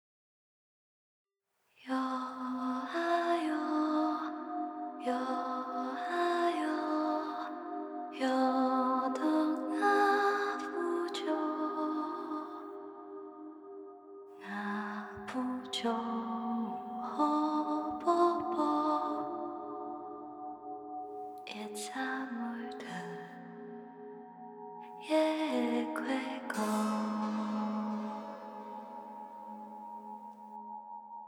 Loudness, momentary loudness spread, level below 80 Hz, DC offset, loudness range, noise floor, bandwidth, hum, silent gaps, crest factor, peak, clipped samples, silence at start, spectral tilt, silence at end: -34 LUFS; 17 LU; -82 dBFS; under 0.1%; 10 LU; -78 dBFS; 17 kHz; none; none; 20 dB; -16 dBFS; under 0.1%; 1.8 s; -5 dB/octave; 0 s